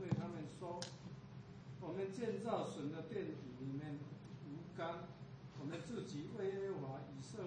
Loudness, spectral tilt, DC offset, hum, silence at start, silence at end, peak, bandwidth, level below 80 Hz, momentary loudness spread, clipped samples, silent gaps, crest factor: -47 LUFS; -6.5 dB/octave; under 0.1%; none; 0 s; 0 s; -26 dBFS; 9.4 kHz; -74 dBFS; 11 LU; under 0.1%; none; 20 dB